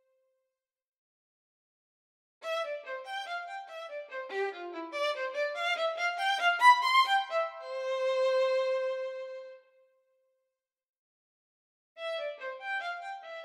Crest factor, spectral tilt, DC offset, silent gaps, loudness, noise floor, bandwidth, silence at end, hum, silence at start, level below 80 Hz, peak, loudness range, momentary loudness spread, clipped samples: 24 dB; 1.5 dB/octave; under 0.1%; 10.89-11.96 s; -30 LUFS; -87 dBFS; 15.5 kHz; 0 s; none; 2.4 s; under -90 dBFS; -8 dBFS; 16 LU; 18 LU; under 0.1%